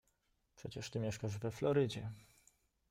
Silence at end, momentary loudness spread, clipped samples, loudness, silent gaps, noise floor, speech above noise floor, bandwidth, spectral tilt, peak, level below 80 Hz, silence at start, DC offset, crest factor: 0.7 s; 16 LU; under 0.1%; -40 LUFS; none; -80 dBFS; 41 dB; 16 kHz; -6 dB/octave; -22 dBFS; -68 dBFS; 0.6 s; under 0.1%; 20 dB